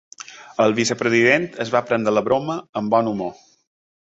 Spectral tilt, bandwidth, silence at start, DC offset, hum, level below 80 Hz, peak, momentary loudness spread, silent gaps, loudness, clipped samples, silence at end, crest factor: -4.5 dB/octave; 8.2 kHz; 0.3 s; under 0.1%; none; -60 dBFS; -2 dBFS; 14 LU; 2.69-2.73 s; -19 LUFS; under 0.1%; 0.75 s; 18 dB